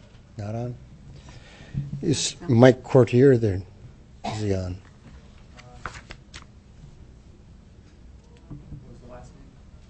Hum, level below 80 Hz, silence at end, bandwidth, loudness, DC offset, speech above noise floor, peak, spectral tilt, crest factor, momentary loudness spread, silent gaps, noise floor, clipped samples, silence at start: none; -48 dBFS; 0.65 s; 8.6 kHz; -22 LUFS; under 0.1%; 29 dB; 0 dBFS; -6 dB/octave; 26 dB; 28 LU; none; -49 dBFS; under 0.1%; 0.35 s